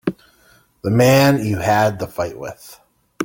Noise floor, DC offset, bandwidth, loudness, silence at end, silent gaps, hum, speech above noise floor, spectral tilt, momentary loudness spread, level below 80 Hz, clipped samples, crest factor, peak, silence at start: -54 dBFS; under 0.1%; 17 kHz; -17 LUFS; 0 s; none; none; 38 dB; -6 dB/octave; 16 LU; -50 dBFS; under 0.1%; 18 dB; -2 dBFS; 0.05 s